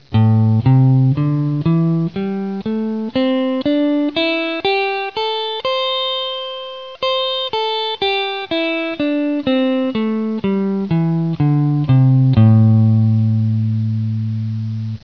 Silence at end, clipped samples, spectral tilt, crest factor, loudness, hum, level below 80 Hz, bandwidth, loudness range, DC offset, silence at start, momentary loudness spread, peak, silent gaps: 0.05 s; under 0.1%; -9 dB/octave; 16 dB; -17 LUFS; none; -48 dBFS; 5.4 kHz; 5 LU; 0.4%; 0.1 s; 9 LU; 0 dBFS; none